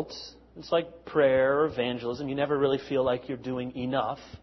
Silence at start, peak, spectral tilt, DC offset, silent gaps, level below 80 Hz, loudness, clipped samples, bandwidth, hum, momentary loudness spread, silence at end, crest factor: 0 s; -10 dBFS; -6.5 dB/octave; under 0.1%; none; -58 dBFS; -28 LUFS; under 0.1%; 6.2 kHz; none; 11 LU; 0.05 s; 18 dB